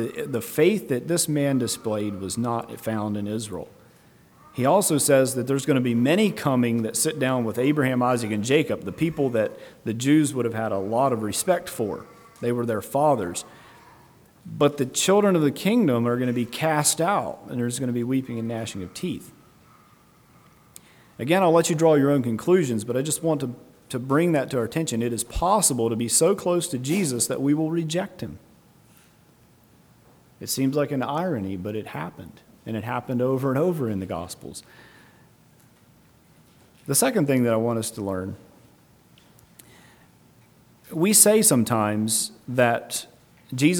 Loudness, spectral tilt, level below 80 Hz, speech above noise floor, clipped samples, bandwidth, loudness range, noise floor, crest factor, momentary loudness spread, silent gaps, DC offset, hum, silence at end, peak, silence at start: -23 LUFS; -4.5 dB/octave; -54 dBFS; 33 dB; under 0.1%; over 20 kHz; 8 LU; -56 dBFS; 24 dB; 14 LU; none; under 0.1%; none; 0 s; 0 dBFS; 0 s